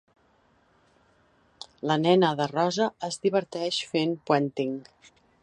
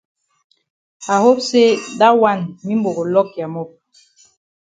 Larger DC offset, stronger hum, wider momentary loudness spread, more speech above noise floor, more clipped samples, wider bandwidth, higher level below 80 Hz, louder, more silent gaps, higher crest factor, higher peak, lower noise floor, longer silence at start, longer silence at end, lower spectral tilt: neither; neither; about the same, 12 LU vs 14 LU; about the same, 39 dB vs 37 dB; neither; first, 10.5 kHz vs 9.4 kHz; second, -72 dBFS vs -64 dBFS; second, -26 LUFS vs -16 LUFS; neither; about the same, 22 dB vs 18 dB; second, -6 dBFS vs 0 dBFS; first, -64 dBFS vs -52 dBFS; first, 1.85 s vs 1 s; second, 0.6 s vs 1.1 s; about the same, -5 dB/octave vs -5 dB/octave